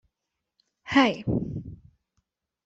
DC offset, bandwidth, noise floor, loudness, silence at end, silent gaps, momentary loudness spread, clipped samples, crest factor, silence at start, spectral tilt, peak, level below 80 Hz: under 0.1%; 7.8 kHz; -84 dBFS; -25 LUFS; 0.9 s; none; 17 LU; under 0.1%; 20 dB; 0.85 s; -6 dB/octave; -10 dBFS; -52 dBFS